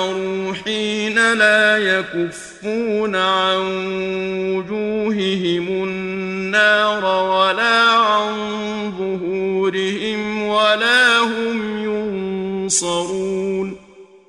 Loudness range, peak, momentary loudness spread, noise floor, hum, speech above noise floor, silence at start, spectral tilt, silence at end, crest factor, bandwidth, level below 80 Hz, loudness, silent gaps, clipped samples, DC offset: 4 LU; -2 dBFS; 11 LU; -44 dBFS; none; 26 dB; 0 s; -3 dB/octave; 0.25 s; 16 dB; 12 kHz; -56 dBFS; -18 LUFS; none; under 0.1%; under 0.1%